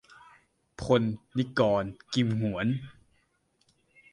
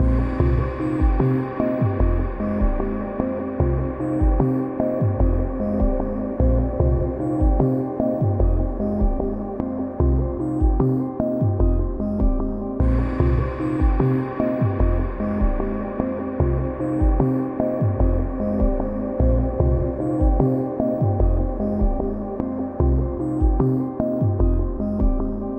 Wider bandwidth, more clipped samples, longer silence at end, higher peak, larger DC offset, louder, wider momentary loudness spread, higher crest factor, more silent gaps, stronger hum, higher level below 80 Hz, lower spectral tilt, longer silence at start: first, 11 kHz vs 3.6 kHz; neither; first, 1.2 s vs 0 s; second, -10 dBFS vs -4 dBFS; neither; second, -29 LUFS vs -22 LUFS; first, 9 LU vs 5 LU; about the same, 20 dB vs 16 dB; neither; neither; second, -58 dBFS vs -24 dBFS; second, -7 dB/octave vs -11.5 dB/octave; first, 0.8 s vs 0 s